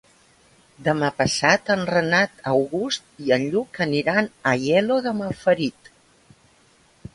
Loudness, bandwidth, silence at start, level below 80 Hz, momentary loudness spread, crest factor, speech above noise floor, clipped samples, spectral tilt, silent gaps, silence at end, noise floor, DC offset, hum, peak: -21 LUFS; 11.5 kHz; 0.8 s; -58 dBFS; 7 LU; 20 dB; 36 dB; under 0.1%; -4.5 dB/octave; none; 1.45 s; -57 dBFS; under 0.1%; none; -2 dBFS